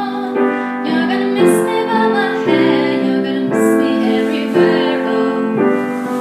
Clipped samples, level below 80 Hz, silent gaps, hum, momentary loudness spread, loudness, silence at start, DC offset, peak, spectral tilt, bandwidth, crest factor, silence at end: under 0.1%; -66 dBFS; none; none; 4 LU; -15 LUFS; 0 s; under 0.1%; 0 dBFS; -5.5 dB/octave; 14.5 kHz; 14 dB; 0 s